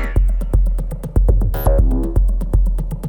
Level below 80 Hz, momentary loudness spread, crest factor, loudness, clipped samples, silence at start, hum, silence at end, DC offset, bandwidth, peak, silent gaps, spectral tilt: -16 dBFS; 5 LU; 14 dB; -19 LUFS; under 0.1%; 0 s; none; 0 s; under 0.1%; 17.5 kHz; -2 dBFS; none; -8.5 dB/octave